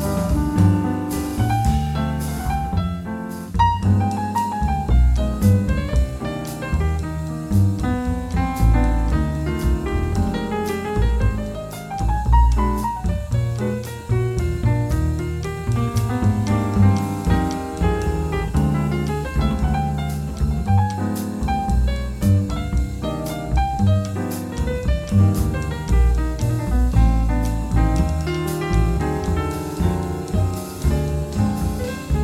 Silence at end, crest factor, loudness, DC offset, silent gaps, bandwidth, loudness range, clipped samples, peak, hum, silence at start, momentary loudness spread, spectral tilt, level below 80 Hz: 0 s; 16 dB; -21 LUFS; under 0.1%; none; 15.5 kHz; 2 LU; under 0.1%; -4 dBFS; none; 0 s; 7 LU; -7 dB/octave; -24 dBFS